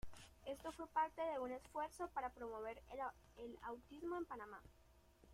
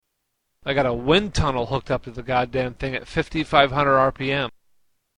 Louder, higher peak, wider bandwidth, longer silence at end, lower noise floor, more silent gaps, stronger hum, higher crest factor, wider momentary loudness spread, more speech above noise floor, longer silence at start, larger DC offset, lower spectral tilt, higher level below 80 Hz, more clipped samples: second, -48 LUFS vs -22 LUFS; second, -28 dBFS vs 0 dBFS; first, 16 kHz vs 10.5 kHz; second, 0 s vs 0.7 s; second, -69 dBFS vs -76 dBFS; neither; neither; about the same, 20 dB vs 22 dB; first, 14 LU vs 9 LU; second, 21 dB vs 54 dB; second, 0.05 s vs 0.65 s; neither; about the same, -5 dB/octave vs -5.5 dB/octave; second, -68 dBFS vs -40 dBFS; neither